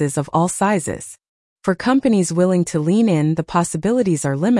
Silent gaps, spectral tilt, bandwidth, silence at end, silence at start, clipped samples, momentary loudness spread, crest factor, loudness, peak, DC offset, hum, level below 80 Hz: 1.28-1.56 s; -6 dB/octave; 12 kHz; 0 s; 0 s; under 0.1%; 8 LU; 12 dB; -18 LUFS; -6 dBFS; under 0.1%; none; -52 dBFS